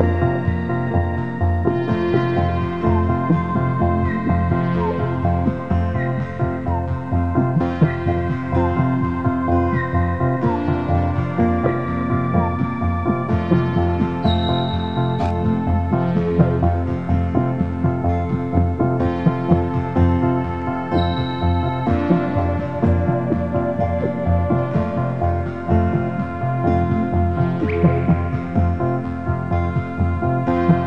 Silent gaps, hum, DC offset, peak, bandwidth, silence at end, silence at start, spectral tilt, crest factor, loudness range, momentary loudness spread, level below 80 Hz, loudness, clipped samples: none; none; 1%; -2 dBFS; 5.6 kHz; 0 s; 0 s; -10 dB/octave; 18 dB; 1 LU; 4 LU; -32 dBFS; -20 LUFS; under 0.1%